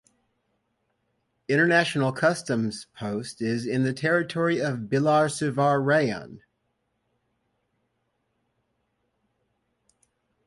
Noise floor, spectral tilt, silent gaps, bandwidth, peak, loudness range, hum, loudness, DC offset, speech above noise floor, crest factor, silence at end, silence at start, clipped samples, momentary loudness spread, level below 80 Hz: -75 dBFS; -5.5 dB/octave; none; 11.5 kHz; -8 dBFS; 5 LU; none; -24 LUFS; under 0.1%; 51 dB; 20 dB; 4.1 s; 1.5 s; under 0.1%; 11 LU; -66 dBFS